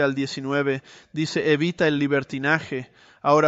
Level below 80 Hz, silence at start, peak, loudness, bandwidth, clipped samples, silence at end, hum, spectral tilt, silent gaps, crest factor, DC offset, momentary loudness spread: -64 dBFS; 0 s; -4 dBFS; -24 LUFS; 8 kHz; under 0.1%; 0 s; none; -6 dB/octave; none; 18 dB; under 0.1%; 11 LU